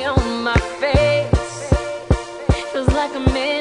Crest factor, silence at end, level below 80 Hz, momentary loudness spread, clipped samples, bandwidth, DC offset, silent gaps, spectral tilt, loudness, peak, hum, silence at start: 18 dB; 0 s; -26 dBFS; 5 LU; under 0.1%; 10.5 kHz; under 0.1%; none; -6 dB/octave; -19 LUFS; 0 dBFS; none; 0 s